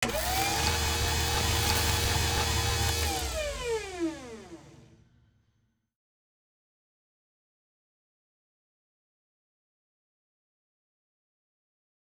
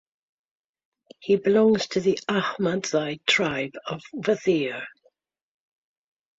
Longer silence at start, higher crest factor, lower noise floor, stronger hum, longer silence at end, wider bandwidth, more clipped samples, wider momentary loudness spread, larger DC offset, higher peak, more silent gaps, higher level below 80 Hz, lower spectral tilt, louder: second, 0 s vs 1.2 s; about the same, 22 dB vs 18 dB; first, -73 dBFS vs -66 dBFS; neither; first, 7.3 s vs 1.5 s; first, over 20 kHz vs 7.8 kHz; neither; second, 9 LU vs 14 LU; neither; second, -12 dBFS vs -8 dBFS; neither; first, -40 dBFS vs -66 dBFS; second, -3 dB/octave vs -4.5 dB/octave; second, -28 LUFS vs -24 LUFS